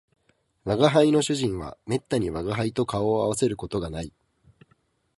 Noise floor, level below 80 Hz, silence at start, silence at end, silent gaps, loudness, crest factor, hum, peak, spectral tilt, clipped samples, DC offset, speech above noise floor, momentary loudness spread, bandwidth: -67 dBFS; -50 dBFS; 0.65 s; 1.1 s; none; -25 LUFS; 22 dB; none; -4 dBFS; -5.5 dB/octave; under 0.1%; under 0.1%; 43 dB; 14 LU; 11.5 kHz